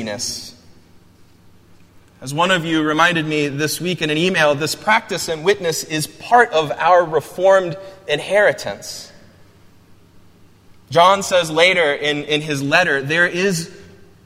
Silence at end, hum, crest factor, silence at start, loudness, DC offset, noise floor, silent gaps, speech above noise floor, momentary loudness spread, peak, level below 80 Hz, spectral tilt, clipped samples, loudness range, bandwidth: 0.45 s; none; 18 dB; 0 s; -17 LUFS; under 0.1%; -48 dBFS; none; 31 dB; 13 LU; 0 dBFS; -56 dBFS; -3.5 dB/octave; under 0.1%; 5 LU; 16 kHz